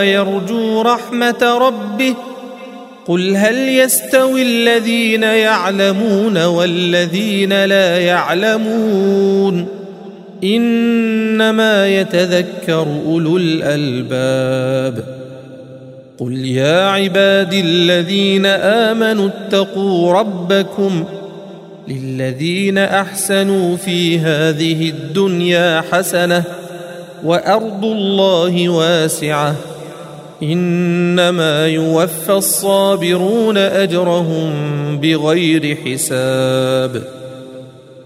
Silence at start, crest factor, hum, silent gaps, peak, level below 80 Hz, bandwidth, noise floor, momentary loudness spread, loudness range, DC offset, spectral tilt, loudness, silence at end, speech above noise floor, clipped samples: 0 s; 14 dB; none; none; 0 dBFS; -62 dBFS; 16 kHz; -35 dBFS; 14 LU; 4 LU; under 0.1%; -4.5 dB/octave; -14 LUFS; 0 s; 21 dB; under 0.1%